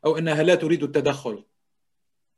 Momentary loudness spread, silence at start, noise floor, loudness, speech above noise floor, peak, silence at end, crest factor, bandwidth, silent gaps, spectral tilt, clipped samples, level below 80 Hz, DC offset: 14 LU; 0.05 s; -83 dBFS; -22 LUFS; 62 dB; -6 dBFS; 0.95 s; 18 dB; 12 kHz; none; -6 dB/octave; under 0.1%; -66 dBFS; under 0.1%